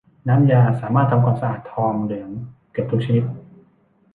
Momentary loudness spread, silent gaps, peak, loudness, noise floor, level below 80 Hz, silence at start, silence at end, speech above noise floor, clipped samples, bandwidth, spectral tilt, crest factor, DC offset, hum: 15 LU; none; -4 dBFS; -19 LUFS; -58 dBFS; -54 dBFS; 0.25 s; 0.75 s; 40 dB; under 0.1%; 3.9 kHz; -11 dB/octave; 16 dB; under 0.1%; none